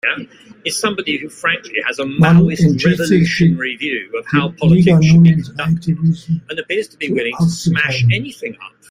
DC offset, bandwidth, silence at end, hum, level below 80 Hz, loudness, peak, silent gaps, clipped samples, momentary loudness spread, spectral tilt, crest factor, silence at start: under 0.1%; 12.5 kHz; 0.2 s; none; -44 dBFS; -15 LUFS; 0 dBFS; none; under 0.1%; 11 LU; -6 dB/octave; 14 dB; 0.05 s